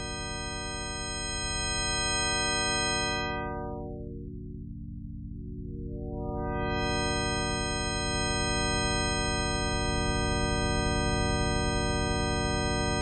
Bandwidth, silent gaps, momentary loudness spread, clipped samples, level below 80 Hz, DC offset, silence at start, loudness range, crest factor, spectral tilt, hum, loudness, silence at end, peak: 8.8 kHz; none; 14 LU; under 0.1%; -38 dBFS; under 0.1%; 0 s; 7 LU; 14 dB; -3.5 dB/octave; none; -29 LUFS; 0 s; -16 dBFS